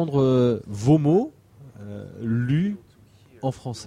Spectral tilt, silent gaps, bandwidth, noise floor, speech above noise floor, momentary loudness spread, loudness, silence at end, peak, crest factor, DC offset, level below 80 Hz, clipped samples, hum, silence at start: -8 dB/octave; none; 11 kHz; -53 dBFS; 31 dB; 19 LU; -23 LUFS; 0 s; -6 dBFS; 16 dB; under 0.1%; -54 dBFS; under 0.1%; none; 0 s